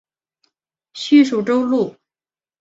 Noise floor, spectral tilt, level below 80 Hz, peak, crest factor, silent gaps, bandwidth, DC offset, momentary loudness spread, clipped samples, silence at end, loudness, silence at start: under -90 dBFS; -5.5 dB/octave; -66 dBFS; -2 dBFS; 16 dB; none; 7.8 kHz; under 0.1%; 15 LU; under 0.1%; 0.7 s; -16 LUFS; 0.95 s